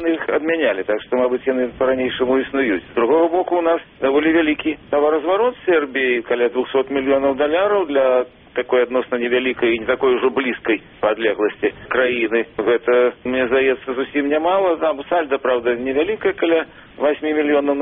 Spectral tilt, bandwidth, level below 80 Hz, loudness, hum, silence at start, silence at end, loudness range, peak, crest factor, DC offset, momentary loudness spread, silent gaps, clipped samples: -2.5 dB/octave; 3.9 kHz; -52 dBFS; -18 LUFS; none; 0 s; 0 s; 1 LU; -4 dBFS; 14 dB; under 0.1%; 4 LU; none; under 0.1%